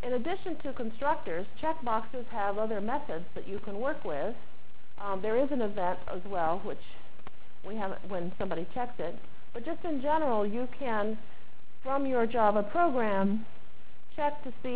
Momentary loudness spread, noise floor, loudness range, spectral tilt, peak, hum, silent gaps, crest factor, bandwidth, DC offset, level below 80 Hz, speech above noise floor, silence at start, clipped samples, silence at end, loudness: 14 LU; -59 dBFS; 6 LU; -9.5 dB/octave; -14 dBFS; none; none; 22 dB; 4 kHz; 4%; -60 dBFS; 27 dB; 0.05 s; under 0.1%; 0 s; -33 LUFS